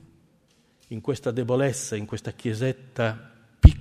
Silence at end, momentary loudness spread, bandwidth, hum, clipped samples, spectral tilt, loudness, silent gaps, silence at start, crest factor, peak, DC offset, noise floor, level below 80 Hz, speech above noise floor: 0 s; 14 LU; 12.5 kHz; none; under 0.1%; -6.5 dB/octave; -25 LUFS; none; 0.9 s; 24 dB; 0 dBFS; under 0.1%; -63 dBFS; -26 dBFS; 35 dB